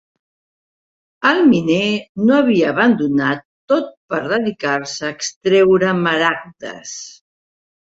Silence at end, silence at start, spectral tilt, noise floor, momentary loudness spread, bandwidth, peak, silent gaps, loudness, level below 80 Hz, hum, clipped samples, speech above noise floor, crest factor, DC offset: 0.85 s; 1.2 s; -5 dB/octave; under -90 dBFS; 15 LU; 8 kHz; -2 dBFS; 2.09-2.15 s, 3.45-3.68 s, 3.97-4.08 s, 5.36-5.41 s; -16 LUFS; -58 dBFS; none; under 0.1%; over 74 dB; 16 dB; under 0.1%